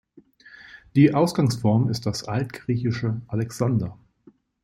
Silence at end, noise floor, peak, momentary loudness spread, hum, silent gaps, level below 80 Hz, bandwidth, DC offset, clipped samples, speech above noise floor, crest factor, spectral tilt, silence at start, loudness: 0.7 s; -56 dBFS; -4 dBFS; 10 LU; none; none; -56 dBFS; 13 kHz; under 0.1%; under 0.1%; 34 dB; 18 dB; -7 dB/octave; 0.7 s; -23 LUFS